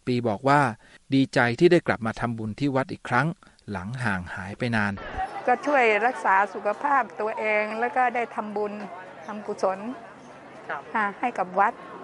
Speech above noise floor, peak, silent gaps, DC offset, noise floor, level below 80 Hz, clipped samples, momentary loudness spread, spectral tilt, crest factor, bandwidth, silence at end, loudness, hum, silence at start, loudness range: 20 dB; -6 dBFS; none; under 0.1%; -45 dBFS; -56 dBFS; under 0.1%; 16 LU; -6.5 dB/octave; 20 dB; 11.5 kHz; 0 s; -25 LUFS; none; 0.05 s; 6 LU